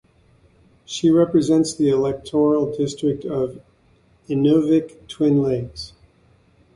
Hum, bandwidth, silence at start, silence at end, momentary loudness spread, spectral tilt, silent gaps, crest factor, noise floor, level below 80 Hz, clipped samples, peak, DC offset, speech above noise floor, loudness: none; 11.5 kHz; 0.9 s; 0.9 s; 12 LU; -7 dB/octave; none; 16 dB; -57 dBFS; -52 dBFS; under 0.1%; -6 dBFS; under 0.1%; 38 dB; -19 LUFS